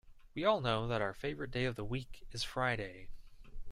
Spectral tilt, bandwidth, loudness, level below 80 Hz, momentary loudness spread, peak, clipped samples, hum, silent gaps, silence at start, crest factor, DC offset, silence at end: -5.5 dB/octave; 15 kHz; -37 LUFS; -52 dBFS; 14 LU; -18 dBFS; under 0.1%; none; none; 0.05 s; 20 dB; under 0.1%; 0 s